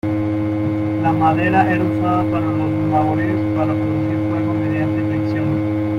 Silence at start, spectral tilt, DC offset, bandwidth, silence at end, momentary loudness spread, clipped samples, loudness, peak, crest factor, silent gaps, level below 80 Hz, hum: 0.05 s; -9.5 dB/octave; under 0.1%; 5.8 kHz; 0 s; 4 LU; under 0.1%; -18 LUFS; -4 dBFS; 14 dB; none; -46 dBFS; none